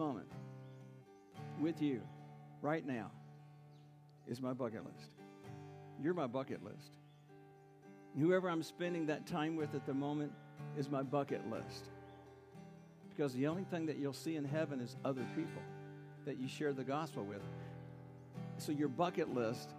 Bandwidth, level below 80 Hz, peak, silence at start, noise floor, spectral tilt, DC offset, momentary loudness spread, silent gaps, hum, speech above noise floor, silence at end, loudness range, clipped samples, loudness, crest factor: 15.5 kHz; -84 dBFS; -22 dBFS; 0 s; -62 dBFS; -7 dB/octave; under 0.1%; 21 LU; none; none; 21 dB; 0 s; 6 LU; under 0.1%; -42 LUFS; 20 dB